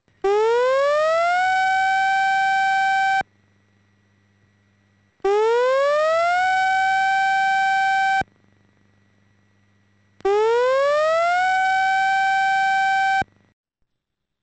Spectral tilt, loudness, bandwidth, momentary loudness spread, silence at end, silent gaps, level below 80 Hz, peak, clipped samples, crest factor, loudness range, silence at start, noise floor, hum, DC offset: -2 dB/octave; -19 LUFS; 8.8 kHz; 4 LU; 1.2 s; none; -60 dBFS; -12 dBFS; under 0.1%; 8 dB; 5 LU; 0.25 s; -78 dBFS; none; under 0.1%